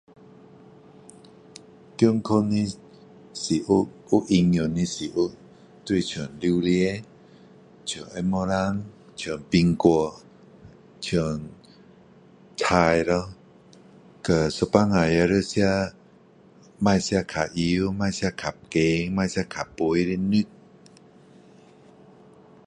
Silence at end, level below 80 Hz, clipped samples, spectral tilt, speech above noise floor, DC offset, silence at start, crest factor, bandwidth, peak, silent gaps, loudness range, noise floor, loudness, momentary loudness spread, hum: 2.2 s; -48 dBFS; under 0.1%; -6 dB/octave; 31 dB; under 0.1%; 2 s; 22 dB; 10.5 kHz; -2 dBFS; none; 4 LU; -53 dBFS; -24 LUFS; 13 LU; none